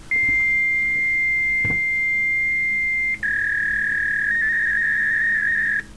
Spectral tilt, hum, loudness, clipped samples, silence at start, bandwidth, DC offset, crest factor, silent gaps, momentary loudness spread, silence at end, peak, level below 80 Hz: -3.5 dB/octave; none; -18 LUFS; under 0.1%; 0 s; 11 kHz; 0.4%; 10 dB; none; 3 LU; 0 s; -12 dBFS; -46 dBFS